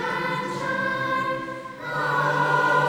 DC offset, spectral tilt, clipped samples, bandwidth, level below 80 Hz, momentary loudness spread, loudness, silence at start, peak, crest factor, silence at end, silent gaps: under 0.1%; -5 dB/octave; under 0.1%; 19.5 kHz; -60 dBFS; 10 LU; -24 LUFS; 0 s; -8 dBFS; 16 dB; 0 s; none